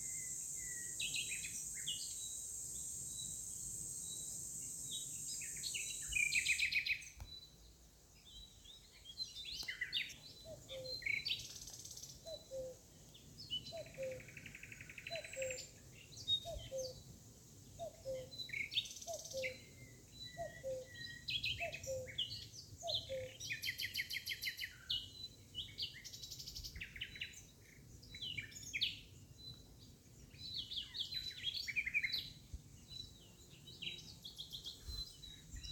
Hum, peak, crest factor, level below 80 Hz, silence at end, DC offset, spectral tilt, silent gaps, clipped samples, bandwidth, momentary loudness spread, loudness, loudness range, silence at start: none; -24 dBFS; 22 dB; -64 dBFS; 0 s; under 0.1%; -0.5 dB/octave; none; under 0.1%; 18 kHz; 18 LU; -43 LUFS; 8 LU; 0 s